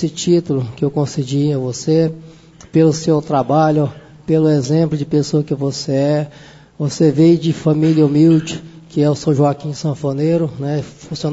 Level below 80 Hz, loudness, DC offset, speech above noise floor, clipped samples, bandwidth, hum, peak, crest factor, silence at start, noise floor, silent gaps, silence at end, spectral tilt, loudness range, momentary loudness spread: -52 dBFS; -16 LUFS; under 0.1%; 25 dB; under 0.1%; 8 kHz; none; -2 dBFS; 14 dB; 0 s; -40 dBFS; none; 0 s; -7 dB/octave; 3 LU; 11 LU